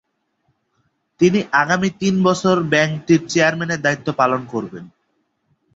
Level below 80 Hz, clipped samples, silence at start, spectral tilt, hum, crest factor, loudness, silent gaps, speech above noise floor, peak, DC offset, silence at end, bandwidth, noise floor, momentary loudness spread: -58 dBFS; under 0.1%; 1.2 s; -5.5 dB/octave; none; 18 dB; -17 LUFS; none; 51 dB; -2 dBFS; under 0.1%; 0.9 s; 8 kHz; -68 dBFS; 8 LU